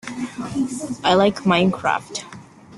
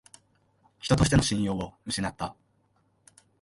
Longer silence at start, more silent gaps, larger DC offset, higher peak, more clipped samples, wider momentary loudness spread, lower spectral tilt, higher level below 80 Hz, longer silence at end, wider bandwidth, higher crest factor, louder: second, 0.05 s vs 0.85 s; neither; neither; first, -2 dBFS vs -8 dBFS; neither; about the same, 15 LU vs 15 LU; about the same, -5 dB/octave vs -5 dB/octave; second, -56 dBFS vs -44 dBFS; second, 0 s vs 1.1 s; about the same, 12 kHz vs 11.5 kHz; about the same, 18 dB vs 22 dB; first, -20 LUFS vs -27 LUFS